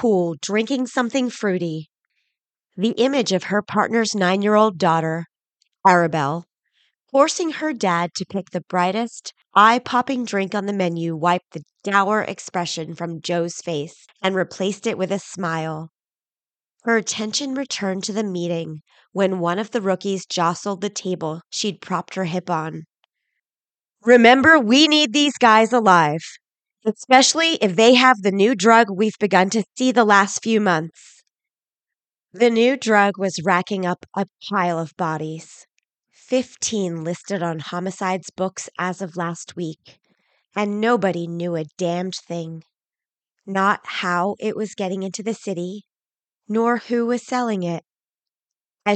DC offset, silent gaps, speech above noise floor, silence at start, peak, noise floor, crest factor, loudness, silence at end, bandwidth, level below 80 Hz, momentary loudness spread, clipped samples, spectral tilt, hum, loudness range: under 0.1%; none; over 70 dB; 0 s; -2 dBFS; under -90 dBFS; 20 dB; -20 LUFS; 0 s; 9.2 kHz; -68 dBFS; 14 LU; under 0.1%; -4 dB/octave; none; 10 LU